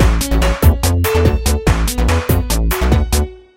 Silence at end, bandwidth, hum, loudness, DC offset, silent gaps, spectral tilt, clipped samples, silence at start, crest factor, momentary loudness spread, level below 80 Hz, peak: 0.2 s; 17 kHz; none; -15 LUFS; under 0.1%; none; -5 dB/octave; under 0.1%; 0 s; 14 dB; 3 LU; -16 dBFS; 0 dBFS